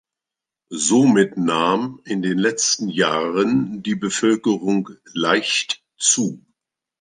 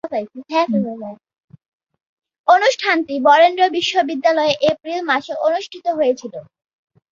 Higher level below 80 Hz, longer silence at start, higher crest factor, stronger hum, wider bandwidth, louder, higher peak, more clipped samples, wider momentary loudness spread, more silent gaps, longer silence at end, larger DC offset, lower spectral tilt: about the same, -64 dBFS vs -66 dBFS; first, 0.7 s vs 0.05 s; about the same, 18 dB vs 16 dB; neither; first, 10 kHz vs 7.6 kHz; about the same, -19 LUFS vs -17 LUFS; about the same, -2 dBFS vs -2 dBFS; neither; second, 9 LU vs 13 LU; second, none vs 1.44-1.48 s, 1.68-1.80 s, 2.09-2.17 s, 2.39-2.44 s; about the same, 0.6 s vs 0.7 s; neither; about the same, -3.5 dB/octave vs -4 dB/octave